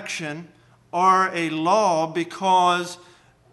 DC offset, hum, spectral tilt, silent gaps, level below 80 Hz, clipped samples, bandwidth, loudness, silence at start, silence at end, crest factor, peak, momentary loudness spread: under 0.1%; none; -4 dB/octave; none; -70 dBFS; under 0.1%; 12.5 kHz; -21 LUFS; 0 s; 0.55 s; 16 dB; -6 dBFS; 15 LU